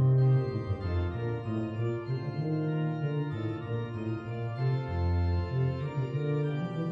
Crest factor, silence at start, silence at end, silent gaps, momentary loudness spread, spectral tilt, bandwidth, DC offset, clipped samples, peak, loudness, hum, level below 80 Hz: 12 dB; 0 s; 0 s; none; 6 LU; -10 dB/octave; 5 kHz; under 0.1%; under 0.1%; -18 dBFS; -31 LUFS; none; -46 dBFS